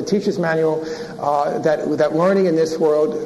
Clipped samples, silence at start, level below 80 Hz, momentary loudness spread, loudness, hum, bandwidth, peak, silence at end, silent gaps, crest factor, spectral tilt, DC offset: under 0.1%; 0 s; -58 dBFS; 6 LU; -18 LUFS; none; 12.5 kHz; -4 dBFS; 0 s; none; 14 dB; -6.5 dB/octave; under 0.1%